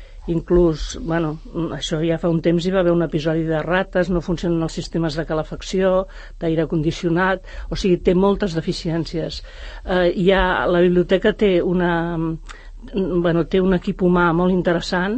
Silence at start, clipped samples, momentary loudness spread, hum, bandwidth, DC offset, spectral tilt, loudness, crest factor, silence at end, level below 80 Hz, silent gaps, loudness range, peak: 0 s; under 0.1%; 10 LU; none; 8.6 kHz; under 0.1%; -6.5 dB/octave; -20 LUFS; 16 dB; 0 s; -34 dBFS; none; 3 LU; -4 dBFS